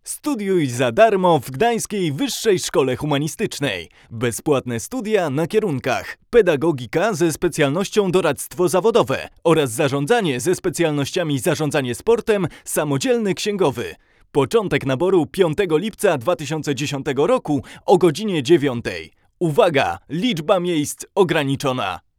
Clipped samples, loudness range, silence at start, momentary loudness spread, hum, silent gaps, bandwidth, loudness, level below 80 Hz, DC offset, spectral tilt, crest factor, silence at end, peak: under 0.1%; 2 LU; 0.05 s; 7 LU; none; none; 18 kHz; -19 LUFS; -50 dBFS; under 0.1%; -5 dB/octave; 18 dB; 0.2 s; 0 dBFS